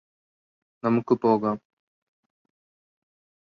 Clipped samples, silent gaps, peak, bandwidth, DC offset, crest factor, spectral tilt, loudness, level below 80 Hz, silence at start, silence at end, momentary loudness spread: under 0.1%; none; -8 dBFS; 6.2 kHz; under 0.1%; 20 dB; -9.5 dB/octave; -24 LUFS; -70 dBFS; 0.85 s; 1.9 s; 9 LU